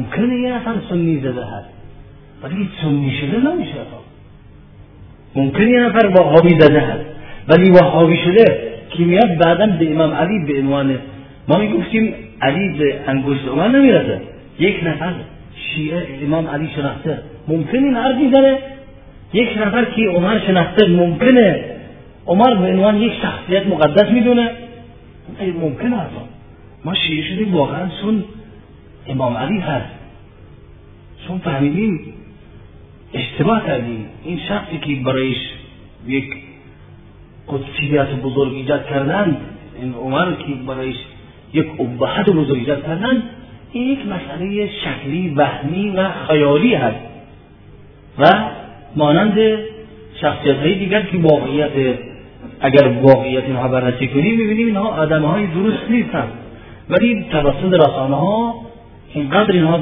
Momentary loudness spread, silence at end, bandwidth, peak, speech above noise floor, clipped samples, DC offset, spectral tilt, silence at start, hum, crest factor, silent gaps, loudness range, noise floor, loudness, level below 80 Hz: 16 LU; 0 s; 5.4 kHz; 0 dBFS; 26 dB; 0.1%; under 0.1%; -10 dB/octave; 0 s; none; 16 dB; none; 10 LU; -41 dBFS; -16 LUFS; -42 dBFS